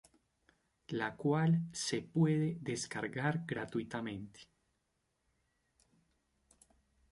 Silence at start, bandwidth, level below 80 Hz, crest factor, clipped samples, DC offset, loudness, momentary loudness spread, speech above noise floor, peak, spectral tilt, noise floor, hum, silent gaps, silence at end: 0.9 s; 11.5 kHz; -72 dBFS; 20 dB; under 0.1%; under 0.1%; -36 LUFS; 11 LU; 46 dB; -18 dBFS; -5.5 dB/octave; -82 dBFS; none; none; 2.7 s